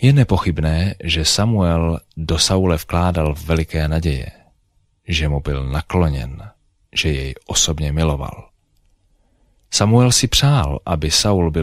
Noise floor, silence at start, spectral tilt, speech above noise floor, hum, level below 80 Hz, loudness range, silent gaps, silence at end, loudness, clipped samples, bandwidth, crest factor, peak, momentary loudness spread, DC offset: -61 dBFS; 0 s; -4.5 dB/octave; 44 dB; none; -28 dBFS; 5 LU; none; 0 s; -17 LUFS; under 0.1%; 16 kHz; 16 dB; -2 dBFS; 10 LU; under 0.1%